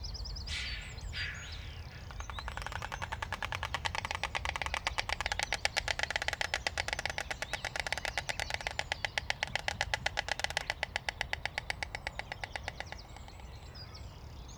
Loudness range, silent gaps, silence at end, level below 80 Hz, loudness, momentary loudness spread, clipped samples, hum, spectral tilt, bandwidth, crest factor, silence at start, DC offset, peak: 6 LU; none; 0 s; -48 dBFS; -36 LUFS; 13 LU; under 0.1%; none; -2 dB/octave; over 20 kHz; 30 dB; 0 s; under 0.1%; -8 dBFS